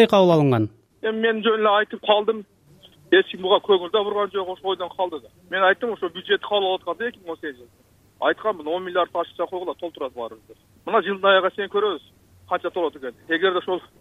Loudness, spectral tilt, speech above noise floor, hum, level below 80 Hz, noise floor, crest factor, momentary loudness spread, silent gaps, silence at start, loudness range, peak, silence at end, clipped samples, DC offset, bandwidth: -22 LUFS; -6.5 dB/octave; 30 dB; none; -66 dBFS; -52 dBFS; 18 dB; 13 LU; none; 0 s; 6 LU; -4 dBFS; 0.2 s; under 0.1%; under 0.1%; 13.5 kHz